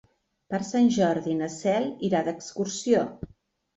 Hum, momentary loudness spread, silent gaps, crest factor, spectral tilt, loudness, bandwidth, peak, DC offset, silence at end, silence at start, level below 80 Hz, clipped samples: none; 11 LU; none; 18 dB; -5.5 dB/octave; -26 LUFS; 8.2 kHz; -8 dBFS; under 0.1%; 0.5 s; 0.5 s; -58 dBFS; under 0.1%